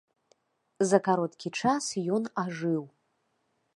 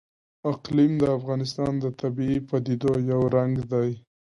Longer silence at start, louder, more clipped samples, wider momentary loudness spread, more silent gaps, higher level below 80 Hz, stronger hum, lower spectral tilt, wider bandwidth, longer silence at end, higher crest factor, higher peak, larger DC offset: first, 0.8 s vs 0.45 s; second, -29 LUFS vs -25 LUFS; neither; about the same, 8 LU vs 8 LU; neither; second, -72 dBFS vs -54 dBFS; neither; second, -5 dB/octave vs -8.5 dB/octave; about the same, 11.5 kHz vs 11 kHz; first, 0.9 s vs 0.35 s; first, 24 dB vs 16 dB; about the same, -8 dBFS vs -10 dBFS; neither